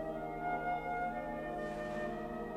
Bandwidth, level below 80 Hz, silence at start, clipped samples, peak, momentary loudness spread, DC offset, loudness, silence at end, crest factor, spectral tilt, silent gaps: 15.5 kHz; -56 dBFS; 0 s; under 0.1%; -26 dBFS; 4 LU; under 0.1%; -39 LUFS; 0 s; 14 dB; -7 dB/octave; none